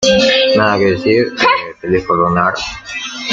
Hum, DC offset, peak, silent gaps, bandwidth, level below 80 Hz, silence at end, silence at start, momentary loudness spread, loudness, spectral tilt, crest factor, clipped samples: none; under 0.1%; 0 dBFS; none; 7.8 kHz; -42 dBFS; 0 s; 0 s; 12 LU; -13 LUFS; -4 dB/octave; 12 dB; under 0.1%